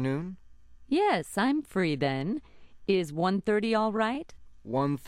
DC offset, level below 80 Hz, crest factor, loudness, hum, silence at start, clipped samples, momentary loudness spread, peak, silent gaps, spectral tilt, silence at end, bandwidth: under 0.1%; -58 dBFS; 16 dB; -29 LUFS; none; 0 s; under 0.1%; 11 LU; -12 dBFS; none; -6.5 dB/octave; 0 s; 16 kHz